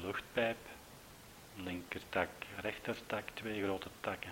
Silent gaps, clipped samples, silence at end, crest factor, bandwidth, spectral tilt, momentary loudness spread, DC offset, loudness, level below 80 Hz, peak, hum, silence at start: none; under 0.1%; 0 s; 22 dB; 16 kHz; -4.5 dB/octave; 17 LU; under 0.1%; -40 LUFS; -66 dBFS; -20 dBFS; none; 0 s